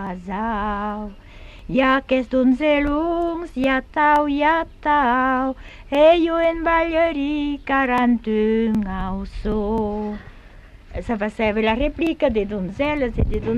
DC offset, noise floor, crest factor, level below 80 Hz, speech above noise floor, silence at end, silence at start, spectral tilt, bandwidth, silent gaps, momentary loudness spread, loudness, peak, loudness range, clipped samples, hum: under 0.1%; -43 dBFS; 16 dB; -34 dBFS; 23 dB; 0 s; 0 s; -7 dB/octave; 9.4 kHz; none; 11 LU; -20 LUFS; -4 dBFS; 6 LU; under 0.1%; none